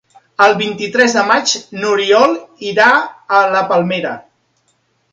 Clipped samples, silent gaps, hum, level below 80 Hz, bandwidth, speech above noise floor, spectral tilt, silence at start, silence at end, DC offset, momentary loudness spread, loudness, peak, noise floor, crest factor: under 0.1%; none; none; -64 dBFS; 9.2 kHz; 48 dB; -3 dB/octave; 0.4 s; 0.9 s; under 0.1%; 9 LU; -13 LUFS; 0 dBFS; -61 dBFS; 14 dB